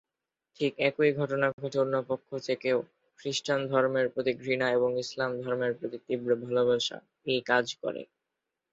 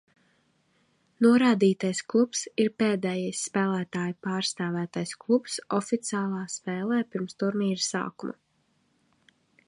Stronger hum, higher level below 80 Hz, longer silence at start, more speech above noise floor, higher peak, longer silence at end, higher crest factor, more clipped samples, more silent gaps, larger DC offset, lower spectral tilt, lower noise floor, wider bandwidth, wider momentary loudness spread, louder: neither; about the same, -74 dBFS vs -74 dBFS; second, 0.6 s vs 1.2 s; first, 60 dB vs 44 dB; about the same, -10 dBFS vs -10 dBFS; second, 0.7 s vs 1.35 s; about the same, 18 dB vs 18 dB; neither; first, 1.53-1.58 s vs none; neither; about the same, -4.5 dB/octave vs -5 dB/octave; first, -88 dBFS vs -70 dBFS; second, 8 kHz vs 11.5 kHz; second, 8 LU vs 11 LU; about the same, -29 LUFS vs -27 LUFS